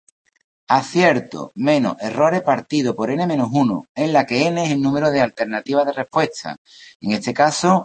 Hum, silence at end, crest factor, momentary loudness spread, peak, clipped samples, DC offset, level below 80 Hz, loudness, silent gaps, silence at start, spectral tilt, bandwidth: none; 0 s; 18 dB; 7 LU; -2 dBFS; under 0.1%; under 0.1%; -60 dBFS; -19 LUFS; 3.89-3.95 s, 6.58-6.65 s, 6.95-7.00 s; 0.7 s; -5.5 dB/octave; 8.8 kHz